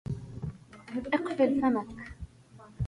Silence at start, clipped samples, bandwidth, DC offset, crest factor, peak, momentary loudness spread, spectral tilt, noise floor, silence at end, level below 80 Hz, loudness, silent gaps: 0.05 s; under 0.1%; 11 kHz; under 0.1%; 20 dB; -12 dBFS; 21 LU; -8 dB/octave; -54 dBFS; 0 s; -50 dBFS; -31 LUFS; none